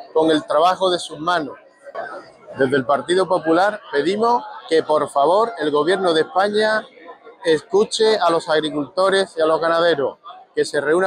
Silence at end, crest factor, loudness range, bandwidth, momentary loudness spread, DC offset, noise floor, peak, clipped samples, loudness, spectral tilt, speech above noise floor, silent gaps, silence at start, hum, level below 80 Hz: 0 s; 12 dB; 2 LU; 11.5 kHz; 9 LU; under 0.1%; -40 dBFS; -6 dBFS; under 0.1%; -18 LUFS; -4 dB/octave; 23 dB; none; 0 s; none; -64 dBFS